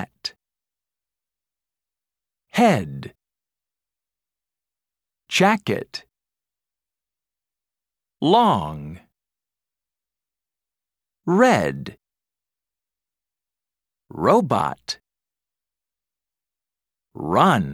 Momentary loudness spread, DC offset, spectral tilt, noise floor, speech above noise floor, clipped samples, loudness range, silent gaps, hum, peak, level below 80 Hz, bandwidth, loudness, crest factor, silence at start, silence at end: 19 LU; under 0.1%; -5.5 dB/octave; under -90 dBFS; over 71 dB; under 0.1%; 2 LU; none; none; -2 dBFS; -58 dBFS; 15.5 kHz; -19 LUFS; 24 dB; 0 s; 0 s